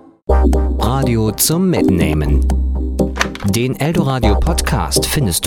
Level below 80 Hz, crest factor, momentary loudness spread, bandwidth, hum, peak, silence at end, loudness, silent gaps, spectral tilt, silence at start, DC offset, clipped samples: -18 dBFS; 14 dB; 4 LU; 17.5 kHz; none; 0 dBFS; 0 s; -15 LUFS; none; -5 dB/octave; 0.3 s; under 0.1%; under 0.1%